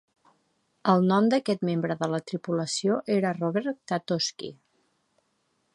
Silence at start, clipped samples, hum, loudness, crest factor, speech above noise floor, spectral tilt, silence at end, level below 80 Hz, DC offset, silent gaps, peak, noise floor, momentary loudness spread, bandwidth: 0.85 s; under 0.1%; none; -26 LUFS; 22 dB; 47 dB; -5.5 dB/octave; 1.2 s; -74 dBFS; under 0.1%; none; -6 dBFS; -73 dBFS; 9 LU; 11.5 kHz